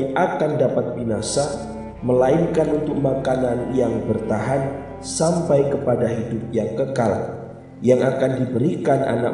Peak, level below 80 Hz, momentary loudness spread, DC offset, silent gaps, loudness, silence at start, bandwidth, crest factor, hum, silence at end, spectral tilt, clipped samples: -4 dBFS; -46 dBFS; 9 LU; under 0.1%; none; -21 LUFS; 0 s; 11.5 kHz; 16 dB; none; 0 s; -6.5 dB/octave; under 0.1%